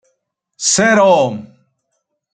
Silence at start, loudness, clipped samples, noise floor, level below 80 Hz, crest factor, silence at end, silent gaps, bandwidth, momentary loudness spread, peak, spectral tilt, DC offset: 0.6 s; -12 LUFS; under 0.1%; -71 dBFS; -62 dBFS; 16 dB; 0.9 s; none; 9.6 kHz; 10 LU; 0 dBFS; -3 dB/octave; under 0.1%